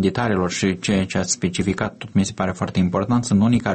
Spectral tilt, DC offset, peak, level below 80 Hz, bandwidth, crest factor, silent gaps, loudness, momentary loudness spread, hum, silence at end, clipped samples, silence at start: -5.5 dB/octave; under 0.1%; -6 dBFS; -46 dBFS; 8.8 kHz; 14 dB; none; -21 LUFS; 5 LU; none; 0 s; under 0.1%; 0 s